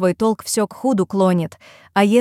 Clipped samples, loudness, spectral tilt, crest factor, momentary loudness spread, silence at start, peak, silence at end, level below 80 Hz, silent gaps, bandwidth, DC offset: under 0.1%; -19 LUFS; -5.5 dB/octave; 16 dB; 6 LU; 0 s; -2 dBFS; 0 s; -58 dBFS; none; 16 kHz; under 0.1%